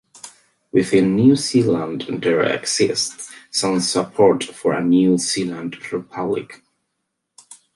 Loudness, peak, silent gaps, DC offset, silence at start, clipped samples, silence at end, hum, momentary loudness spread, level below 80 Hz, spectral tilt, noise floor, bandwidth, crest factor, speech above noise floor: -19 LUFS; -2 dBFS; none; under 0.1%; 0.25 s; under 0.1%; 0.2 s; none; 13 LU; -58 dBFS; -4.5 dB/octave; -76 dBFS; 11.5 kHz; 16 dB; 58 dB